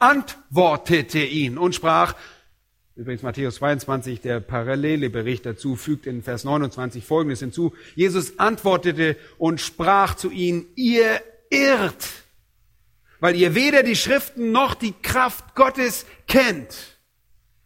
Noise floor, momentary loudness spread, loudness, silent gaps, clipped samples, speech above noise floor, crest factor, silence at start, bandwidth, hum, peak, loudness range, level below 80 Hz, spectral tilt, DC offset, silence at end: -62 dBFS; 11 LU; -21 LUFS; none; under 0.1%; 42 dB; 20 dB; 0 s; 16.5 kHz; none; -2 dBFS; 6 LU; -48 dBFS; -5 dB/octave; under 0.1%; 0.8 s